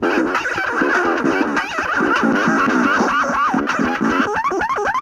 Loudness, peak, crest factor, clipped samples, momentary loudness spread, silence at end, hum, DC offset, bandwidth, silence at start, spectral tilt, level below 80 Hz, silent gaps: -17 LUFS; -4 dBFS; 14 dB; under 0.1%; 4 LU; 0 s; none; under 0.1%; 14.5 kHz; 0 s; -4.5 dB/octave; -48 dBFS; none